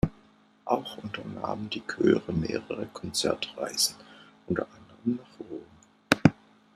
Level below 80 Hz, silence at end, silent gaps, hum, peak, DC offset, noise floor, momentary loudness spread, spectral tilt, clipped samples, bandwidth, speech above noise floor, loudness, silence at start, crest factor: -52 dBFS; 0.4 s; none; none; -2 dBFS; under 0.1%; -60 dBFS; 17 LU; -4.5 dB/octave; under 0.1%; 13.5 kHz; 30 dB; -29 LUFS; 0.05 s; 28 dB